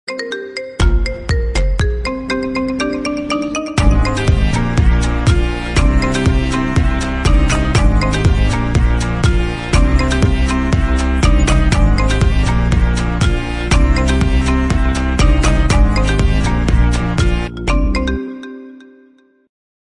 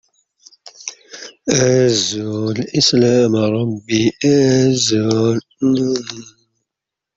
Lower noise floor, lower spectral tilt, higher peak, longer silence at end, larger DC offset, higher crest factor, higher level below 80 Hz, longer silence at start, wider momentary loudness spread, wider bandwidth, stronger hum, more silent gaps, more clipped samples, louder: second, -49 dBFS vs -84 dBFS; first, -6 dB/octave vs -4.5 dB/octave; about the same, 0 dBFS vs -2 dBFS; first, 1 s vs 0.85 s; neither; about the same, 12 dB vs 16 dB; first, -16 dBFS vs -54 dBFS; second, 0.1 s vs 0.65 s; second, 5 LU vs 18 LU; first, 11 kHz vs 8 kHz; neither; neither; neither; about the same, -15 LUFS vs -15 LUFS